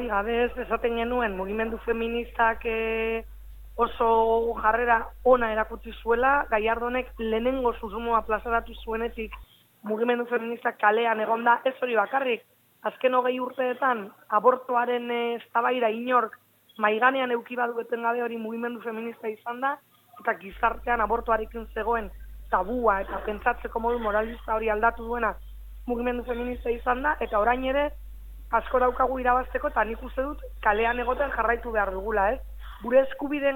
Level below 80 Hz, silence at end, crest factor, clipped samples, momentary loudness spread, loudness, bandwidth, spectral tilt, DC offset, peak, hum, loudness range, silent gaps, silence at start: -44 dBFS; 0 s; 20 dB; under 0.1%; 10 LU; -26 LUFS; 17.5 kHz; -6.5 dB/octave; under 0.1%; -6 dBFS; none; 4 LU; none; 0 s